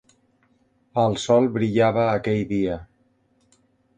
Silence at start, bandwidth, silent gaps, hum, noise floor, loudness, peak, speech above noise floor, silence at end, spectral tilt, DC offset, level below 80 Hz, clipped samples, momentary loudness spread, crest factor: 0.95 s; 9.6 kHz; none; none; -64 dBFS; -22 LUFS; -6 dBFS; 44 dB; 1.15 s; -6.5 dB/octave; under 0.1%; -52 dBFS; under 0.1%; 8 LU; 18 dB